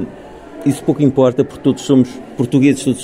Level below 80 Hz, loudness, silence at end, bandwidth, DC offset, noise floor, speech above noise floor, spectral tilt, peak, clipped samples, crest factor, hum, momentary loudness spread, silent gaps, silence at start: -48 dBFS; -15 LUFS; 0 s; 13 kHz; under 0.1%; -34 dBFS; 20 dB; -7 dB/octave; 0 dBFS; under 0.1%; 14 dB; none; 12 LU; none; 0 s